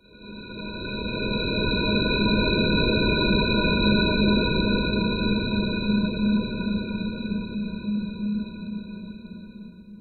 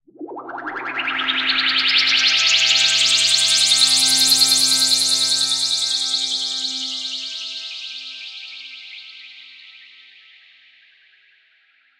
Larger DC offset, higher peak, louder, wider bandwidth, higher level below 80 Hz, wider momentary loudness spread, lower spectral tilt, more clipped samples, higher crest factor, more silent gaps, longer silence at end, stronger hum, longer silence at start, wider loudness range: neither; second, -8 dBFS vs 0 dBFS; second, -24 LUFS vs -15 LUFS; second, 4.4 kHz vs 16 kHz; first, -36 dBFS vs -72 dBFS; second, 17 LU vs 20 LU; first, -9.5 dB/octave vs 2 dB/octave; neither; about the same, 16 dB vs 20 dB; neither; second, 0 s vs 2.3 s; neither; about the same, 0.15 s vs 0.2 s; second, 8 LU vs 18 LU